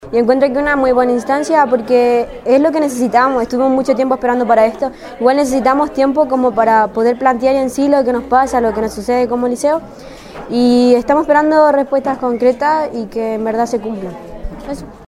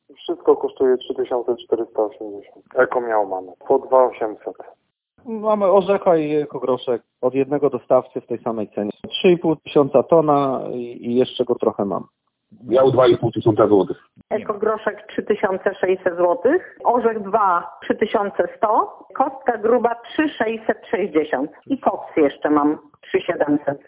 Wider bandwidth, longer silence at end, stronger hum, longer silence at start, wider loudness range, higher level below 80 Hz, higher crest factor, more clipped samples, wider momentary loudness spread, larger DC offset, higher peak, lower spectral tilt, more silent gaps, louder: first, 14 kHz vs 4 kHz; about the same, 0.1 s vs 0.1 s; neither; second, 0 s vs 0.2 s; about the same, 2 LU vs 3 LU; first, -40 dBFS vs -60 dBFS; about the same, 14 dB vs 18 dB; neither; about the same, 11 LU vs 10 LU; neither; about the same, 0 dBFS vs -2 dBFS; second, -5 dB/octave vs -10.5 dB/octave; neither; first, -13 LUFS vs -20 LUFS